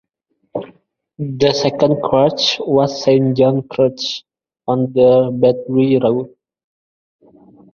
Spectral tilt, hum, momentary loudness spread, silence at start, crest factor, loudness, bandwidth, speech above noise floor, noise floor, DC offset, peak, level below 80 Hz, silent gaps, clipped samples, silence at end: -6 dB/octave; none; 16 LU; 0.55 s; 16 dB; -15 LUFS; 7 kHz; 54 dB; -68 dBFS; under 0.1%; 0 dBFS; -54 dBFS; none; under 0.1%; 1.45 s